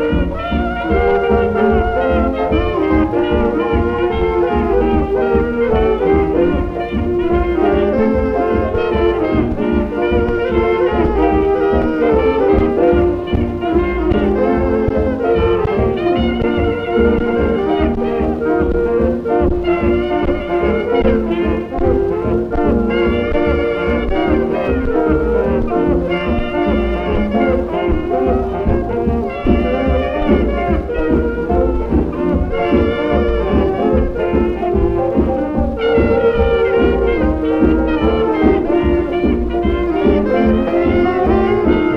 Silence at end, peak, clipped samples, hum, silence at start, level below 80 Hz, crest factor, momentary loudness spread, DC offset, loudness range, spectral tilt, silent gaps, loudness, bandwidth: 0 s; 0 dBFS; under 0.1%; none; 0 s; -24 dBFS; 14 dB; 4 LU; under 0.1%; 2 LU; -9 dB/octave; none; -15 LUFS; 6 kHz